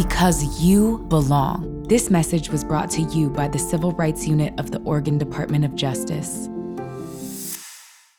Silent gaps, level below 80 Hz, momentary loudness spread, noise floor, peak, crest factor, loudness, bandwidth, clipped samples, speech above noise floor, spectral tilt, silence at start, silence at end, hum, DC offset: none; -36 dBFS; 13 LU; -45 dBFS; -4 dBFS; 16 dB; -21 LUFS; over 20 kHz; under 0.1%; 25 dB; -5.5 dB/octave; 0 s; 0.35 s; none; 0.1%